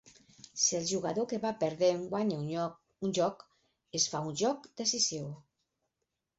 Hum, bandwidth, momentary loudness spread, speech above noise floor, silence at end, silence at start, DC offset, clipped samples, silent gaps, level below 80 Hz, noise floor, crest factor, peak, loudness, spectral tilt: none; 8 kHz; 10 LU; 53 dB; 1 s; 0.05 s; under 0.1%; under 0.1%; none; -74 dBFS; -86 dBFS; 20 dB; -14 dBFS; -32 LUFS; -4.5 dB/octave